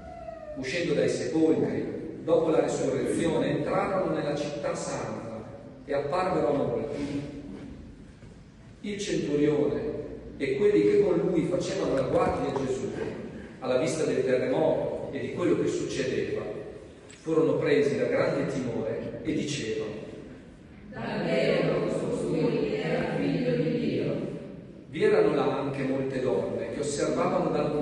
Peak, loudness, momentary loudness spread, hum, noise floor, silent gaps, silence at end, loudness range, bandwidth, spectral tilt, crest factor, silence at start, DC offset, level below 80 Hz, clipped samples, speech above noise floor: -12 dBFS; -28 LUFS; 15 LU; none; -49 dBFS; none; 0 s; 5 LU; 11.5 kHz; -6 dB/octave; 16 dB; 0 s; under 0.1%; -54 dBFS; under 0.1%; 23 dB